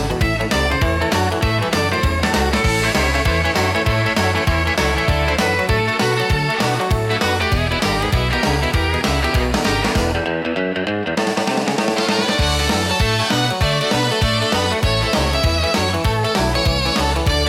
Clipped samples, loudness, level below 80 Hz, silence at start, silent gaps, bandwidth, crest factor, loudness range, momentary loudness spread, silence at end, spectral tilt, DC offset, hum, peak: under 0.1%; -17 LUFS; -26 dBFS; 0 s; none; 17 kHz; 12 dB; 2 LU; 2 LU; 0 s; -4.5 dB/octave; under 0.1%; none; -4 dBFS